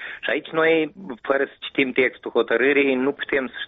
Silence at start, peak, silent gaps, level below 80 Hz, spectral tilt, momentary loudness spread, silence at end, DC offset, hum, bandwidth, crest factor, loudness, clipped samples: 0 s; -8 dBFS; none; -62 dBFS; -2 dB/octave; 7 LU; 0 s; under 0.1%; none; 4.4 kHz; 14 dB; -21 LUFS; under 0.1%